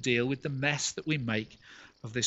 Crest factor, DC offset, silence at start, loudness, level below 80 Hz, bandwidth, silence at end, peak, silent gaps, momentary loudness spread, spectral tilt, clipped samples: 20 dB; under 0.1%; 0 s; -31 LUFS; -64 dBFS; 8.2 kHz; 0 s; -12 dBFS; none; 19 LU; -4 dB/octave; under 0.1%